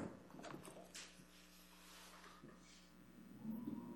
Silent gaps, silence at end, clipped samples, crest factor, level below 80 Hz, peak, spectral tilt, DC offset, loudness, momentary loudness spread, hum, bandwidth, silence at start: none; 0 s; under 0.1%; 18 dB; -76 dBFS; -36 dBFS; -4.5 dB/octave; under 0.1%; -56 LUFS; 13 LU; none; 17.5 kHz; 0 s